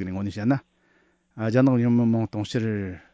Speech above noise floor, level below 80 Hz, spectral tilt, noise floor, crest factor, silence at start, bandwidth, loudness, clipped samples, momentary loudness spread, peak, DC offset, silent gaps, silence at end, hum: 41 dB; -52 dBFS; -8 dB/octave; -64 dBFS; 14 dB; 0 s; 8 kHz; -24 LUFS; under 0.1%; 10 LU; -10 dBFS; under 0.1%; none; 0.15 s; none